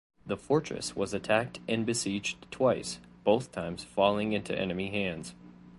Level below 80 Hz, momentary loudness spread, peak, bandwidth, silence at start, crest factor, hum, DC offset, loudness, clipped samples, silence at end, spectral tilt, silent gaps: -60 dBFS; 10 LU; -8 dBFS; 11.5 kHz; 0.25 s; 22 dB; none; under 0.1%; -31 LUFS; under 0.1%; 0 s; -4.5 dB/octave; none